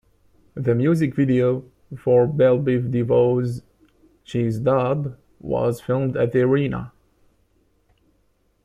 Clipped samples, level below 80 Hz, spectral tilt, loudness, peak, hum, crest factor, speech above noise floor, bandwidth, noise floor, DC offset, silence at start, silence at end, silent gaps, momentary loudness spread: under 0.1%; -52 dBFS; -9 dB/octave; -21 LUFS; -6 dBFS; none; 16 dB; 44 dB; 13 kHz; -64 dBFS; under 0.1%; 0.55 s; 1.75 s; none; 13 LU